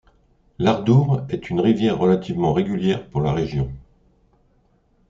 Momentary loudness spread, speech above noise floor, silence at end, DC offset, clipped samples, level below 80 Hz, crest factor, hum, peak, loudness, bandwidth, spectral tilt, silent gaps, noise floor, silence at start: 8 LU; 41 dB; 1.3 s; under 0.1%; under 0.1%; -46 dBFS; 16 dB; none; -4 dBFS; -20 LUFS; 7.4 kHz; -8.5 dB/octave; none; -61 dBFS; 0.6 s